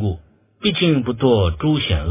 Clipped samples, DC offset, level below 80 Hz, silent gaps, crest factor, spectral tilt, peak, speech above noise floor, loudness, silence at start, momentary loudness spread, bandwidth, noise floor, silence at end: under 0.1%; under 0.1%; -30 dBFS; none; 16 dB; -11 dB/octave; -2 dBFS; 24 dB; -18 LUFS; 0 s; 7 LU; 3.9 kHz; -41 dBFS; 0 s